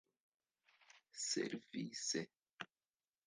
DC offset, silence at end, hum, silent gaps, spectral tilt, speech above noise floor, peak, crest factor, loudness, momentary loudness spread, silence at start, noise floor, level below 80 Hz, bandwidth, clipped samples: under 0.1%; 0.6 s; none; none; -2.5 dB/octave; over 46 dB; -26 dBFS; 22 dB; -44 LUFS; 14 LU; 0.95 s; under -90 dBFS; under -90 dBFS; 10.5 kHz; under 0.1%